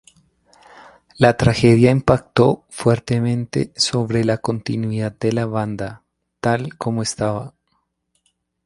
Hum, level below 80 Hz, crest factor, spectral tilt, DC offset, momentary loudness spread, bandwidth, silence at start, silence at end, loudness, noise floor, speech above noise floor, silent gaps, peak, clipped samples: none; -44 dBFS; 20 dB; -6 dB/octave; under 0.1%; 10 LU; 11.5 kHz; 1.2 s; 1.15 s; -19 LUFS; -69 dBFS; 51 dB; none; 0 dBFS; under 0.1%